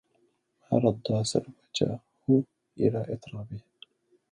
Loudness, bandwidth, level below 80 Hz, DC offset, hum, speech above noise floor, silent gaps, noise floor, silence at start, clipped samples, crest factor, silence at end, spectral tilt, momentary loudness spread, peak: -29 LUFS; 11.5 kHz; -62 dBFS; under 0.1%; none; 43 dB; none; -71 dBFS; 0.7 s; under 0.1%; 20 dB; 0.7 s; -6.5 dB/octave; 15 LU; -8 dBFS